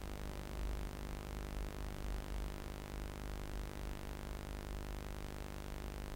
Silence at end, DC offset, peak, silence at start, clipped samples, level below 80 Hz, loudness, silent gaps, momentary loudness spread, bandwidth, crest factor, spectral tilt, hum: 0 s; under 0.1%; -28 dBFS; 0 s; under 0.1%; -46 dBFS; -47 LUFS; none; 2 LU; 16.5 kHz; 16 dB; -5.5 dB/octave; none